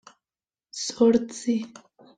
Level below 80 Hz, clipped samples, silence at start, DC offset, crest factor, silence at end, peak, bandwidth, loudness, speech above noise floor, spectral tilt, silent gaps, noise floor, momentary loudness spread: -64 dBFS; under 0.1%; 0.75 s; under 0.1%; 18 dB; 0.5 s; -8 dBFS; 9.4 kHz; -24 LUFS; over 67 dB; -4.5 dB/octave; none; under -90 dBFS; 18 LU